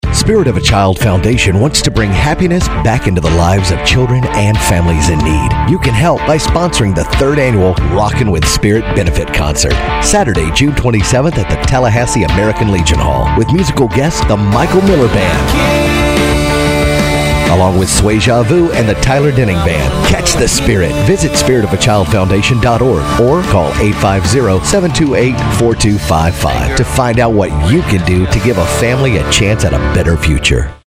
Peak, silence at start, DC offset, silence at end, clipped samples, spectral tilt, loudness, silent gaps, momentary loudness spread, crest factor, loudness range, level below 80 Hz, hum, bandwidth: 0 dBFS; 0.05 s; under 0.1%; 0.15 s; under 0.1%; -5 dB/octave; -10 LUFS; none; 2 LU; 10 dB; 1 LU; -20 dBFS; none; 16 kHz